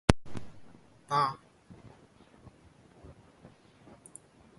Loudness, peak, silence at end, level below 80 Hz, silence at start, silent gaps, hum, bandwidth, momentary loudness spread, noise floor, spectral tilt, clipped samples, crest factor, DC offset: -32 LUFS; 0 dBFS; 1.45 s; -48 dBFS; 0.1 s; none; none; 11.5 kHz; 28 LU; -59 dBFS; -5.5 dB/octave; under 0.1%; 36 dB; under 0.1%